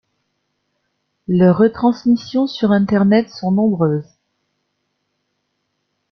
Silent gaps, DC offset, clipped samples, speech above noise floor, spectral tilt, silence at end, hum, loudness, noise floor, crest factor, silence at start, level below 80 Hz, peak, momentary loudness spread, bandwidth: none; under 0.1%; under 0.1%; 57 dB; -8.5 dB/octave; 2.1 s; 50 Hz at -35 dBFS; -16 LUFS; -71 dBFS; 16 dB; 1.3 s; -56 dBFS; -2 dBFS; 7 LU; 6.2 kHz